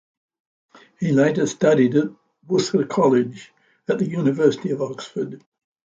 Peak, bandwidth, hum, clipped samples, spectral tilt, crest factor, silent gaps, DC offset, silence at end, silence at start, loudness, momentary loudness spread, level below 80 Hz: -4 dBFS; 9 kHz; none; under 0.1%; -6.5 dB/octave; 18 dB; none; under 0.1%; 0.6 s; 1 s; -21 LUFS; 12 LU; -66 dBFS